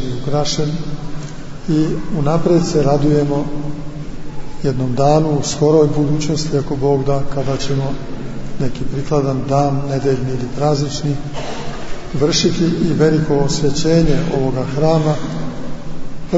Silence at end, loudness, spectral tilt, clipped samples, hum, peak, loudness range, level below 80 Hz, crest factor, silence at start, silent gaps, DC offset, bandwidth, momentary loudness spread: 0 s; -17 LUFS; -6 dB/octave; under 0.1%; none; -2 dBFS; 3 LU; -30 dBFS; 14 dB; 0 s; none; under 0.1%; 8 kHz; 15 LU